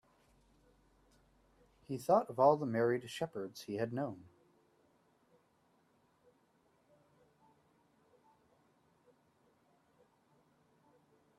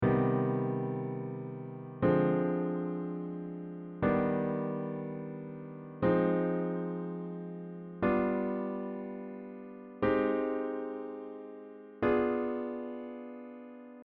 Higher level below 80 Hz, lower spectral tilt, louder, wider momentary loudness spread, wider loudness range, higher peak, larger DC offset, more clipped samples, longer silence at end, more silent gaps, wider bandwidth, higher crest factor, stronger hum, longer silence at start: second, -78 dBFS vs -60 dBFS; second, -6.5 dB/octave vs -8 dB/octave; about the same, -35 LUFS vs -33 LUFS; about the same, 15 LU vs 16 LU; first, 11 LU vs 3 LU; about the same, -16 dBFS vs -14 dBFS; neither; neither; first, 7.2 s vs 0 s; neither; first, 13.5 kHz vs 4.7 kHz; first, 26 dB vs 18 dB; neither; first, 1.9 s vs 0 s